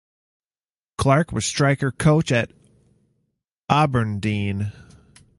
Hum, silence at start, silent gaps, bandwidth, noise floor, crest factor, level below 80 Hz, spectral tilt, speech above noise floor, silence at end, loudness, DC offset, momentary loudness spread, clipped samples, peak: none; 1 s; 3.51-3.64 s; 11.5 kHz; under -90 dBFS; 22 dB; -46 dBFS; -5.5 dB/octave; over 70 dB; 0.65 s; -21 LUFS; under 0.1%; 12 LU; under 0.1%; -2 dBFS